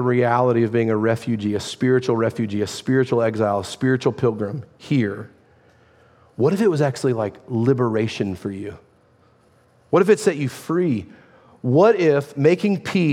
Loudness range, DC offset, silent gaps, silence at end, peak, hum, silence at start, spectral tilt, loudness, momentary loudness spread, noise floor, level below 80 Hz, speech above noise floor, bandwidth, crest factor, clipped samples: 4 LU; under 0.1%; none; 0 s; -4 dBFS; none; 0 s; -7 dB/octave; -20 LUFS; 10 LU; -56 dBFS; -64 dBFS; 37 dB; 15 kHz; 18 dB; under 0.1%